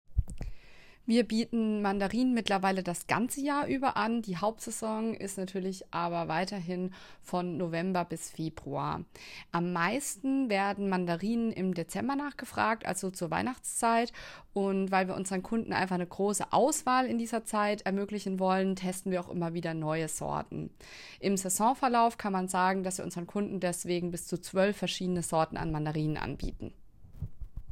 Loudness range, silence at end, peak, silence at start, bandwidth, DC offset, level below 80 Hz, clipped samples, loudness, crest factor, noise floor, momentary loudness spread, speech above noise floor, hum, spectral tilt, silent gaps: 4 LU; 0 s; -10 dBFS; 0.1 s; 16 kHz; under 0.1%; -50 dBFS; under 0.1%; -32 LUFS; 22 dB; -53 dBFS; 10 LU; 22 dB; none; -5 dB/octave; none